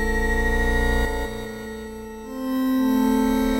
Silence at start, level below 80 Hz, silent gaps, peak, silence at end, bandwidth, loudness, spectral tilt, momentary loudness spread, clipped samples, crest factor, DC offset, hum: 0 s; -28 dBFS; none; -8 dBFS; 0 s; 16 kHz; -23 LUFS; -5.5 dB/octave; 14 LU; under 0.1%; 14 dB; under 0.1%; none